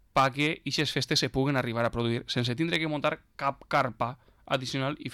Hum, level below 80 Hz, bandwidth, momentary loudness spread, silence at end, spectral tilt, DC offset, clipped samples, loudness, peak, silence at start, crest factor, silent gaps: none; -54 dBFS; 17.5 kHz; 7 LU; 0 s; -4.5 dB/octave; under 0.1%; under 0.1%; -29 LUFS; -14 dBFS; 0.15 s; 14 dB; none